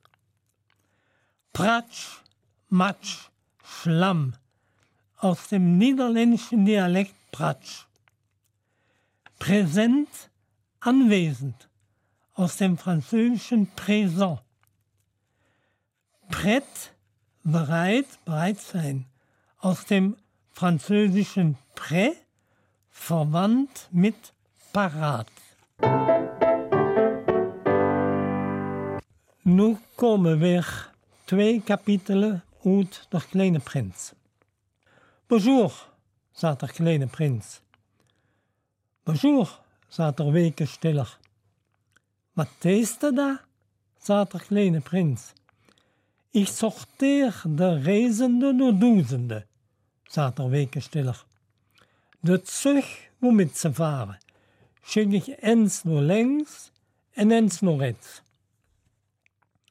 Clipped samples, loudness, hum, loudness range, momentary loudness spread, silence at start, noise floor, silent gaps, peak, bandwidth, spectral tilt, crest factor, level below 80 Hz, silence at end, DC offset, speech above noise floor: under 0.1%; -24 LUFS; none; 5 LU; 14 LU; 1.55 s; -76 dBFS; none; -8 dBFS; 15.5 kHz; -6.5 dB/octave; 16 dB; -64 dBFS; 1.55 s; under 0.1%; 54 dB